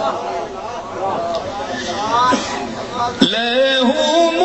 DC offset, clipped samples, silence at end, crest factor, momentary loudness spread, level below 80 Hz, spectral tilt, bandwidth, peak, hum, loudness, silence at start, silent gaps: under 0.1%; under 0.1%; 0 s; 18 dB; 11 LU; -48 dBFS; -3.5 dB/octave; 8.4 kHz; 0 dBFS; none; -18 LUFS; 0 s; none